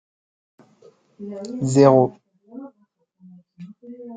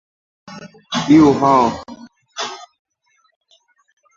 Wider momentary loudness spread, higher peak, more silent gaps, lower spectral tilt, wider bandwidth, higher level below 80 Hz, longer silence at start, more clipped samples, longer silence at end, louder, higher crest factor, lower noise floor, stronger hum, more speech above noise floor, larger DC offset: first, 29 LU vs 26 LU; about the same, -2 dBFS vs -2 dBFS; neither; first, -7.5 dB/octave vs -5.5 dB/octave; first, 9.4 kHz vs 7.6 kHz; second, -66 dBFS vs -50 dBFS; first, 1.2 s vs 0.5 s; neither; second, 0 s vs 1.55 s; about the same, -17 LUFS vs -15 LUFS; about the same, 22 dB vs 18 dB; about the same, -65 dBFS vs -63 dBFS; neither; about the same, 47 dB vs 49 dB; neither